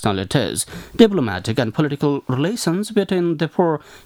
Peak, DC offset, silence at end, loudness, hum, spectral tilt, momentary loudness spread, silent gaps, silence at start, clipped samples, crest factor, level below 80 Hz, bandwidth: 0 dBFS; under 0.1%; 0.1 s; -19 LUFS; none; -5.5 dB/octave; 7 LU; none; 0 s; under 0.1%; 18 dB; -50 dBFS; 18 kHz